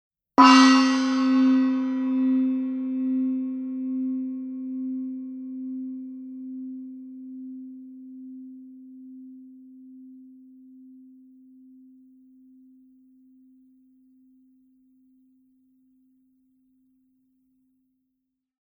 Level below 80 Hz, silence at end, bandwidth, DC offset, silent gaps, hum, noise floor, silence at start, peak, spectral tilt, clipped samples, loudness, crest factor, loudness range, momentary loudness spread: -76 dBFS; 8.35 s; 9 kHz; under 0.1%; none; none; -80 dBFS; 0.4 s; 0 dBFS; -2.5 dB/octave; under 0.1%; -22 LUFS; 26 dB; 27 LU; 27 LU